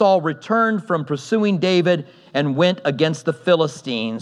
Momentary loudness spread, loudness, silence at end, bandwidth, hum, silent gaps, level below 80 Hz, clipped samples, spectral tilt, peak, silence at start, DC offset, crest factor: 6 LU; -19 LUFS; 0 s; 11 kHz; none; none; -78 dBFS; under 0.1%; -6 dB/octave; -2 dBFS; 0 s; under 0.1%; 16 dB